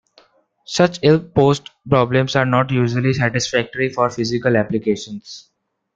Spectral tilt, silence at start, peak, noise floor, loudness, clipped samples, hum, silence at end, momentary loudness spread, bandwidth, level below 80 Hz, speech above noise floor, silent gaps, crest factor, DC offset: -6 dB/octave; 0.7 s; -2 dBFS; -55 dBFS; -18 LUFS; under 0.1%; none; 0.55 s; 10 LU; 7.8 kHz; -50 dBFS; 37 dB; none; 16 dB; under 0.1%